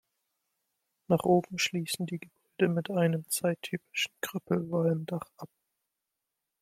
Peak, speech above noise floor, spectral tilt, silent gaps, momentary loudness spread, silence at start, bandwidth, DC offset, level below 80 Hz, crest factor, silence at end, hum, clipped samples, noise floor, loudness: -10 dBFS; 56 dB; -5 dB/octave; none; 13 LU; 1.1 s; 16 kHz; under 0.1%; -72 dBFS; 22 dB; 1.15 s; none; under 0.1%; -86 dBFS; -30 LUFS